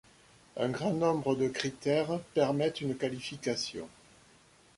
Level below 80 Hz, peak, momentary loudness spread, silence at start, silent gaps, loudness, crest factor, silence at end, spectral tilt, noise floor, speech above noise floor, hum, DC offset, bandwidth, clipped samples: -66 dBFS; -12 dBFS; 8 LU; 0.55 s; none; -32 LUFS; 20 dB; 0.9 s; -5.5 dB/octave; -61 dBFS; 30 dB; none; under 0.1%; 11.5 kHz; under 0.1%